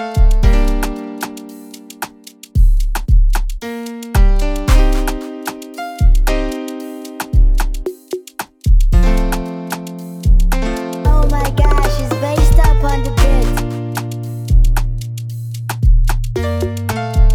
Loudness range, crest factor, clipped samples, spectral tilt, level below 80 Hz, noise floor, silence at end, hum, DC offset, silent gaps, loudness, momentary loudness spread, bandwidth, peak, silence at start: 4 LU; 12 dB; under 0.1%; -6 dB/octave; -14 dBFS; -39 dBFS; 0 s; none; under 0.1%; none; -17 LUFS; 12 LU; 15.5 kHz; 0 dBFS; 0 s